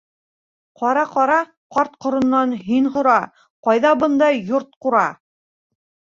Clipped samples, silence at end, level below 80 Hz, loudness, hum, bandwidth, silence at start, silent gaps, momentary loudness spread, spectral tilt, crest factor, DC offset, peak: under 0.1%; 0.9 s; -62 dBFS; -18 LUFS; none; 7.6 kHz; 0.8 s; 1.57-1.70 s, 3.50-3.63 s, 4.76-4.81 s; 8 LU; -6 dB/octave; 16 dB; under 0.1%; -2 dBFS